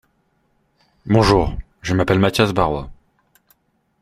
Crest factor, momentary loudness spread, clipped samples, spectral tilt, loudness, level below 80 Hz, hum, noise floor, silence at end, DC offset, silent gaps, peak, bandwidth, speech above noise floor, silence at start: 20 dB; 15 LU; under 0.1%; -6 dB/octave; -18 LUFS; -36 dBFS; none; -64 dBFS; 1.1 s; under 0.1%; none; 0 dBFS; 15.5 kHz; 48 dB; 1.05 s